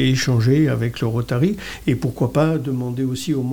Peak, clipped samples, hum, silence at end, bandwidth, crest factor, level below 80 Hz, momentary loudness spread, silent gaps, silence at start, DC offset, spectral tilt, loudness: -6 dBFS; under 0.1%; none; 0 s; 18 kHz; 14 dB; -44 dBFS; 7 LU; none; 0 s; under 0.1%; -6.5 dB/octave; -20 LUFS